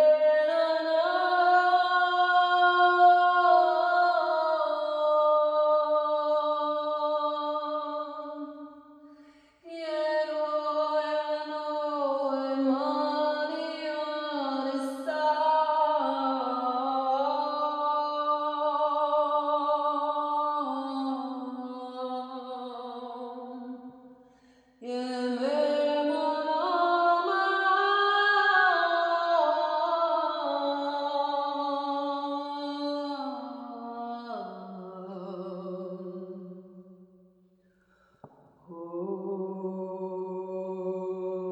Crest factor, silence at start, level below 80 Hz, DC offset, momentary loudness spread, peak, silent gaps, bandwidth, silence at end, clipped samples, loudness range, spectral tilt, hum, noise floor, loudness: 16 dB; 0 s; -84 dBFS; under 0.1%; 16 LU; -10 dBFS; none; 9.4 kHz; 0 s; under 0.1%; 16 LU; -5 dB/octave; none; -65 dBFS; -27 LUFS